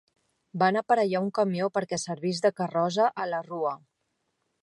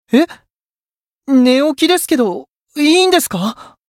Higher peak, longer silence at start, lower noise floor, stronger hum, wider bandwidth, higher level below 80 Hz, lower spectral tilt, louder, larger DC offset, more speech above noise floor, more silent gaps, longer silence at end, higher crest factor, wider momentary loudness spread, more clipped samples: second, -10 dBFS vs 0 dBFS; first, 0.55 s vs 0.1 s; second, -78 dBFS vs under -90 dBFS; neither; second, 11.5 kHz vs 16.5 kHz; second, -76 dBFS vs -60 dBFS; first, -5 dB/octave vs -3.5 dB/octave; second, -27 LUFS vs -13 LUFS; neither; second, 51 dB vs over 77 dB; second, none vs 0.52-0.56 s, 0.62-0.87 s, 0.96-1.19 s, 2.56-2.66 s; first, 0.85 s vs 0.25 s; about the same, 18 dB vs 14 dB; second, 7 LU vs 13 LU; neither